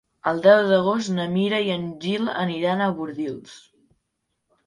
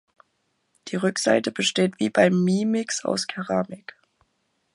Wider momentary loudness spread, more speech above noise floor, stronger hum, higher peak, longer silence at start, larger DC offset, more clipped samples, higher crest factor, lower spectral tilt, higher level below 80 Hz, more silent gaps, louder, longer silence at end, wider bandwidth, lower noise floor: about the same, 13 LU vs 12 LU; first, 55 dB vs 49 dB; neither; about the same, -2 dBFS vs -4 dBFS; second, 0.25 s vs 0.85 s; neither; neither; about the same, 22 dB vs 20 dB; first, -6 dB/octave vs -4.5 dB/octave; about the same, -64 dBFS vs -68 dBFS; neither; about the same, -22 LUFS vs -23 LUFS; about the same, 1.1 s vs 1 s; about the same, 11.5 kHz vs 11.5 kHz; first, -77 dBFS vs -72 dBFS